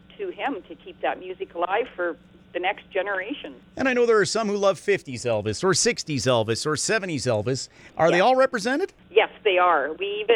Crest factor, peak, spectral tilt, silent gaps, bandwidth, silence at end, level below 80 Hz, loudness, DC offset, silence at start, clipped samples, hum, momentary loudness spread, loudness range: 20 dB; -4 dBFS; -3.5 dB/octave; none; 14 kHz; 0 s; -60 dBFS; -23 LUFS; under 0.1%; 0.2 s; under 0.1%; none; 14 LU; 6 LU